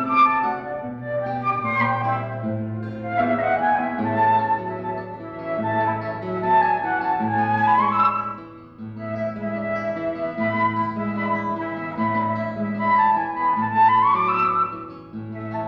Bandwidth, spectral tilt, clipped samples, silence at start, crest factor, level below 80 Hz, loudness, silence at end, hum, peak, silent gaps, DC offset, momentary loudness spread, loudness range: 6.2 kHz; -8.5 dB/octave; under 0.1%; 0 s; 16 dB; -58 dBFS; -22 LUFS; 0 s; none; -6 dBFS; none; under 0.1%; 13 LU; 4 LU